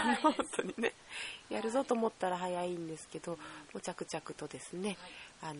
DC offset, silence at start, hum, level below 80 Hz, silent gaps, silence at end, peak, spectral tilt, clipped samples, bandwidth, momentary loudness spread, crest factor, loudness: under 0.1%; 0 s; none; -72 dBFS; none; 0 s; -14 dBFS; -4 dB/octave; under 0.1%; 10.5 kHz; 13 LU; 22 dB; -38 LUFS